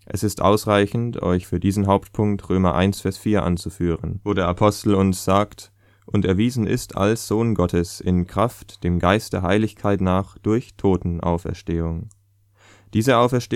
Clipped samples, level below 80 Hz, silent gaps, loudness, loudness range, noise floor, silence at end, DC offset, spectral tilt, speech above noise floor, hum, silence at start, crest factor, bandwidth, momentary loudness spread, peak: under 0.1%; -42 dBFS; none; -21 LUFS; 2 LU; -57 dBFS; 0 s; under 0.1%; -6.5 dB/octave; 37 dB; none; 0.1 s; 20 dB; 15.5 kHz; 7 LU; 0 dBFS